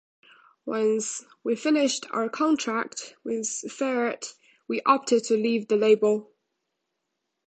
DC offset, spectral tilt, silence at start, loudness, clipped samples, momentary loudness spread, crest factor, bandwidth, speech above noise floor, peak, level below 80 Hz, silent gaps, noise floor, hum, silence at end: under 0.1%; -3.5 dB/octave; 0.65 s; -25 LUFS; under 0.1%; 11 LU; 20 dB; 9.2 kHz; 56 dB; -6 dBFS; -76 dBFS; none; -81 dBFS; none; 1.25 s